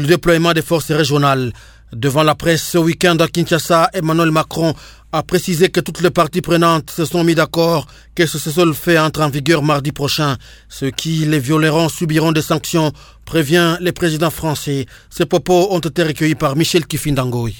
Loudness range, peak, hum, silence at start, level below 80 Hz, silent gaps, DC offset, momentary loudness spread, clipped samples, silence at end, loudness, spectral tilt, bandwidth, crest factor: 2 LU; 0 dBFS; none; 0 s; -40 dBFS; none; under 0.1%; 7 LU; under 0.1%; 0 s; -15 LUFS; -5 dB/octave; 19 kHz; 16 dB